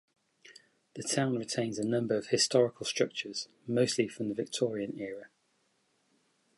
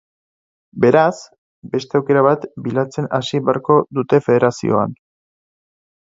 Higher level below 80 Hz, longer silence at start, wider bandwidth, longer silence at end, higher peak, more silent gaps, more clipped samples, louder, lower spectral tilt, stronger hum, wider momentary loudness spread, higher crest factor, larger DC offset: second, -76 dBFS vs -58 dBFS; second, 0.45 s vs 0.75 s; first, 11.5 kHz vs 7.8 kHz; first, 1.3 s vs 1.1 s; second, -12 dBFS vs 0 dBFS; second, none vs 1.38-1.62 s; neither; second, -32 LUFS vs -17 LUFS; second, -4 dB/octave vs -7 dB/octave; neither; about the same, 13 LU vs 11 LU; about the same, 22 dB vs 18 dB; neither